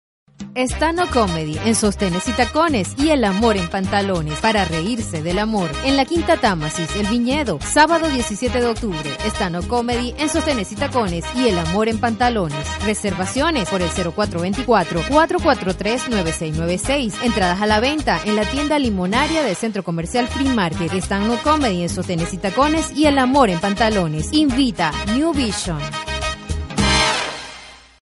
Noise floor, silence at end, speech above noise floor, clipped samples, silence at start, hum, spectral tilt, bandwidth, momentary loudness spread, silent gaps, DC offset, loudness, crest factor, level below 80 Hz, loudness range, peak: -40 dBFS; 0.3 s; 22 dB; under 0.1%; 0.4 s; none; -4.5 dB/octave; 11.5 kHz; 7 LU; none; under 0.1%; -19 LUFS; 18 dB; -34 dBFS; 2 LU; 0 dBFS